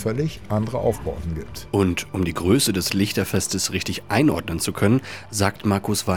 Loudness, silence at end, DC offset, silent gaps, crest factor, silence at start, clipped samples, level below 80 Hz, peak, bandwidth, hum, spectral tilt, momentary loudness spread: -22 LUFS; 0 s; under 0.1%; none; 18 dB; 0 s; under 0.1%; -42 dBFS; -4 dBFS; 19 kHz; none; -4.5 dB/octave; 8 LU